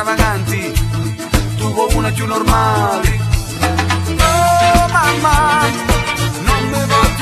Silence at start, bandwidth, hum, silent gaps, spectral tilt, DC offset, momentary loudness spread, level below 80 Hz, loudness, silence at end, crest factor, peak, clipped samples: 0 s; 14.5 kHz; none; none; -4.5 dB/octave; under 0.1%; 7 LU; -22 dBFS; -14 LUFS; 0 s; 14 dB; 0 dBFS; under 0.1%